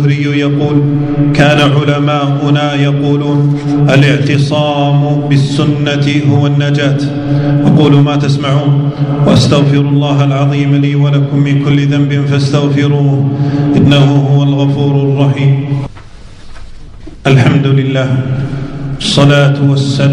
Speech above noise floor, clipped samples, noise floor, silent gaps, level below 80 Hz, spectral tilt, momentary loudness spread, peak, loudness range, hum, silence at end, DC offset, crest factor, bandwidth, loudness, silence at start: 21 dB; 1%; -30 dBFS; none; -36 dBFS; -7 dB/octave; 5 LU; 0 dBFS; 3 LU; none; 0 s; under 0.1%; 10 dB; 10 kHz; -10 LUFS; 0 s